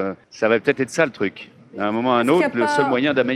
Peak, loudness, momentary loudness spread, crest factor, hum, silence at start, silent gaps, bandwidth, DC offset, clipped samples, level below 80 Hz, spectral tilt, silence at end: -2 dBFS; -20 LUFS; 9 LU; 18 dB; none; 0 s; none; 13.5 kHz; under 0.1%; under 0.1%; -64 dBFS; -5.5 dB/octave; 0 s